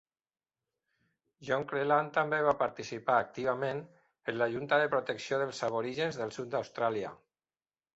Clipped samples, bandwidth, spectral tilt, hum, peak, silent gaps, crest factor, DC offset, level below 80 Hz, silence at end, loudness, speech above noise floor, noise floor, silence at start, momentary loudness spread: under 0.1%; 8.2 kHz; -5 dB/octave; none; -14 dBFS; none; 20 dB; under 0.1%; -74 dBFS; 0.8 s; -32 LUFS; over 58 dB; under -90 dBFS; 1.4 s; 10 LU